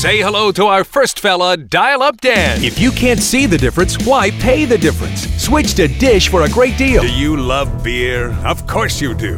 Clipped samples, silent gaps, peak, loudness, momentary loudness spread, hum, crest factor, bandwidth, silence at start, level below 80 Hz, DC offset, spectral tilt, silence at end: under 0.1%; none; 0 dBFS; -13 LUFS; 6 LU; none; 12 dB; 17.5 kHz; 0 s; -24 dBFS; under 0.1%; -4.5 dB/octave; 0 s